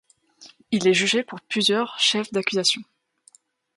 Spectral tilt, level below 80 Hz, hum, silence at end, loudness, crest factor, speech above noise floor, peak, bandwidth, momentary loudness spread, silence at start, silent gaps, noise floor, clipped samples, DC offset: -3 dB/octave; -70 dBFS; none; 0.95 s; -21 LUFS; 20 dB; 35 dB; -6 dBFS; 11.5 kHz; 8 LU; 0.4 s; none; -58 dBFS; under 0.1%; under 0.1%